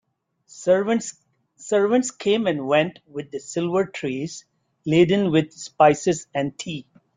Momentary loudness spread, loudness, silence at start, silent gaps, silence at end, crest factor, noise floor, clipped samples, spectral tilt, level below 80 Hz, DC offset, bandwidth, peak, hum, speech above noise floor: 16 LU; -22 LUFS; 0.55 s; none; 0.35 s; 20 dB; -56 dBFS; under 0.1%; -5 dB/octave; -62 dBFS; under 0.1%; 9.6 kHz; -4 dBFS; none; 35 dB